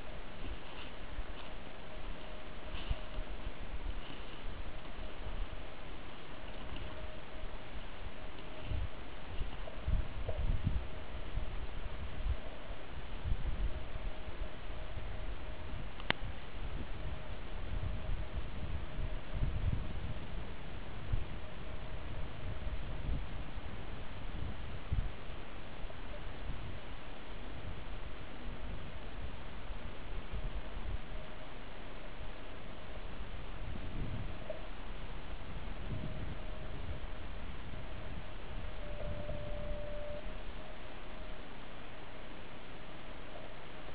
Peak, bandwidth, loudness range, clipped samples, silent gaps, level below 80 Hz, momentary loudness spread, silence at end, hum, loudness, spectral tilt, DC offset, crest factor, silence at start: -10 dBFS; 4 kHz; 5 LU; under 0.1%; none; -44 dBFS; 8 LU; 0 s; none; -45 LUFS; -4.5 dB/octave; 1%; 30 dB; 0 s